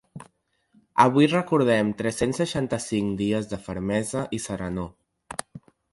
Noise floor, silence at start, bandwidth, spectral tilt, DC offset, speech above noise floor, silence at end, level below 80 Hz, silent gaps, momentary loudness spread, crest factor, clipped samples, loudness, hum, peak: -66 dBFS; 0.15 s; 11.5 kHz; -5.5 dB/octave; under 0.1%; 43 dB; 0.35 s; -52 dBFS; none; 14 LU; 24 dB; under 0.1%; -24 LUFS; none; -2 dBFS